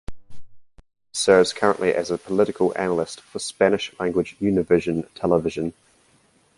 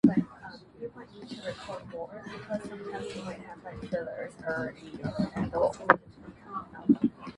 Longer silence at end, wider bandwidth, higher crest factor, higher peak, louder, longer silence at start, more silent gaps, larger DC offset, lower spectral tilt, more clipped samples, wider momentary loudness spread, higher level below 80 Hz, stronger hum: first, 0.85 s vs 0.05 s; about the same, 11.5 kHz vs 11 kHz; second, 20 dB vs 32 dB; about the same, -2 dBFS vs 0 dBFS; first, -22 LUFS vs -32 LUFS; about the same, 0.1 s vs 0.05 s; neither; neither; second, -5 dB/octave vs -7 dB/octave; neither; second, 13 LU vs 18 LU; first, -52 dBFS vs -58 dBFS; neither